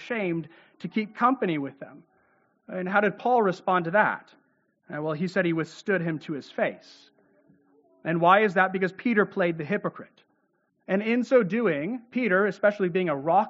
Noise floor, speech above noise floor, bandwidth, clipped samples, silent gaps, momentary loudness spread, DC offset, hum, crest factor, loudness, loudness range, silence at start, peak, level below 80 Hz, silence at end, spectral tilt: -72 dBFS; 46 dB; 7.6 kHz; under 0.1%; none; 13 LU; under 0.1%; none; 22 dB; -25 LUFS; 5 LU; 0 s; -6 dBFS; -76 dBFS; 0 s; -5 dB/octave